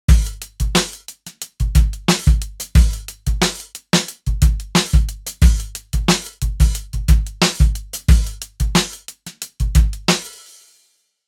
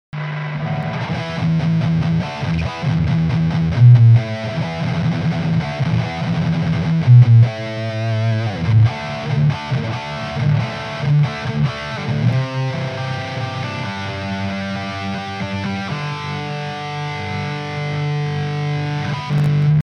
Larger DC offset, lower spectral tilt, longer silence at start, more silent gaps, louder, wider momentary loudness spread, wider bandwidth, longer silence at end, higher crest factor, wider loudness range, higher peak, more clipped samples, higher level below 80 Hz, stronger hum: neither; second, -4.5 dB/octave vs -7.5 dB/octave; about the same, 0.1 s vs 0.15 s; neither; about the same, -18 LUFS vs -18 LUFS; about the same, 12 LU vs 12 LU; first, 16.5 kHz vs 6.6 kHz; first, 0.95 s vs 0.05 s; about the same, 16 dB vs 16 dB; second, 1 LU vs 8 LU; about the same, -2 dBFS vs -2 dBFS; neither; first, -18 dBFS vs -42 dBFS; neither